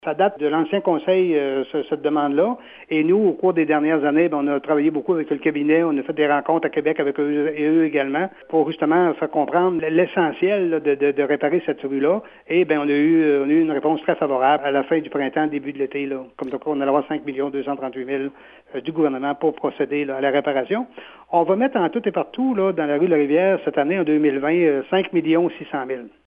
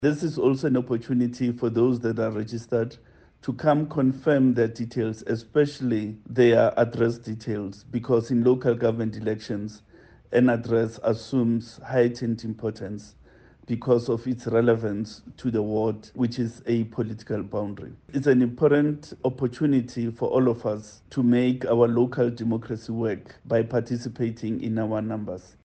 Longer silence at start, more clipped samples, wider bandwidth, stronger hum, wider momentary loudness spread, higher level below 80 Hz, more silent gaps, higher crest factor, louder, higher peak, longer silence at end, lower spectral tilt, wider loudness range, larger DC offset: about the same, 0.05 s vs 0 s; neither; second, 3.8 kHz vs 8.6 kHz; neither; second, 8 LU vs 11 LU; second, -68 dBFS vs -58 dBFS; neither; about the same, 16 dB vs 18 dB; first, -20 LUFS vs -25 LUFS; about the same, -4 dBFS vs -6 dBFS; about the same, 0.2 s vs 0.25 s; first, -9.5 dB/octave vs -8 dB/octave; about the same, 5 LU vs 4 LU; neither